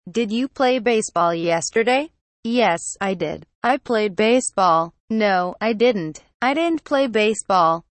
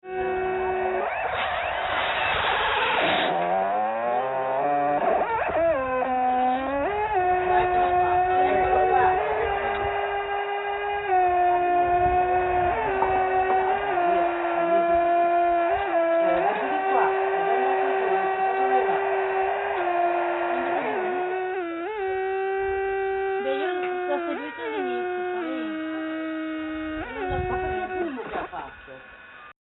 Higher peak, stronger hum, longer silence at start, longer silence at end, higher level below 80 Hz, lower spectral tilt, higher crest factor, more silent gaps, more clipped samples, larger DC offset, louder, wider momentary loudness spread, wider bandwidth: about the same, -6 dBFS vs -8 dBFS; neither; about the same, 0.05 s vs 0.05 s; about the same, 0.2 s vs 0.2 s; second, -60 dBFS vs -48 dBFS; first, -4 dB/octave vs -2.5 dB/octave; about the same, 14 dB vs 16 dB; first, 2.21-2.43 s, 3.55-3.62 s, 5.00-5.08 s, 6.34-6.40 s vs none; neither; neither; first, -20 LUFS vs -24 LUFS; about the same, 7 LU vs 9 LU; first, 8.8 kHz vs 4.1 kHz